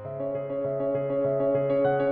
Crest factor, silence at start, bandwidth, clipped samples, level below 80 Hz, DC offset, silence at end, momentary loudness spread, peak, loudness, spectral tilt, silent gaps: 12 dB; 0 s; 4.2 kHz; under 0.1%; -60 dBFS; under 0.1%; 0 s; 7 LU; -14 dBFS; -27 LUFS; -7.5 dB/octave; none